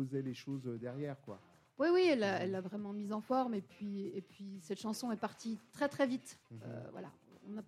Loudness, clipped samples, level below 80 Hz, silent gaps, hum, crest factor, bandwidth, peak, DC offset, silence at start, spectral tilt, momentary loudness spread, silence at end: -38 LUFS; under 0.1%; -84 dBFS; none; none; 18 dB; 14 kHz; -20 dBFS; under 0.1%; 0 s; -6 dB/octave; 18 LU; 0.05 s